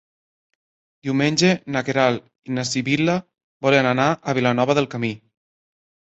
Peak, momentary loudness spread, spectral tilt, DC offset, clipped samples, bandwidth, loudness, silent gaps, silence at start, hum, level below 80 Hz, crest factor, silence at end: -2 dBFS; 10 LU; -5 dB/octave; under 0.1%; under 0.1%; 8.2 kHz; -20 LUFS; 3.44-3.60 s; 1.05 s; none; -60 dBFS; 20 dB; 0.95 s